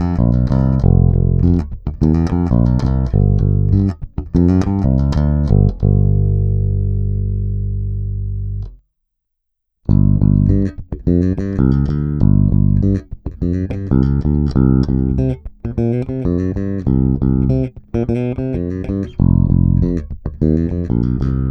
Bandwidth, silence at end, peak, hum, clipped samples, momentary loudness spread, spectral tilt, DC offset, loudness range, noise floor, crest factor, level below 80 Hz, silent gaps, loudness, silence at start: 6.2 kHz; 0 s; 0 dBFS; 50 Hz at -35 dBFS; under 0.1%; 9 LU; -11 dB/octave; under 0.1%; 4 LU; -74 dBFS; 14 dB; -22 dBFS; none; -16 LUFS; 0 s